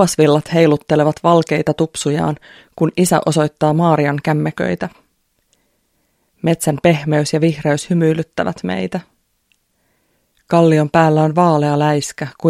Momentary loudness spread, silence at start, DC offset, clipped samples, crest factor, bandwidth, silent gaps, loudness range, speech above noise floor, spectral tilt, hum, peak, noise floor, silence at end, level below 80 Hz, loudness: 9 LU; 0 s; under 0.1%; under 0.1%; 16 dB; 14.5 kHz; none; 4 LU; 49 dB; -6 dB/octave; none; 0 dBFS; -64 dBFS; 0 s; -52 dBFS; -15 LUFS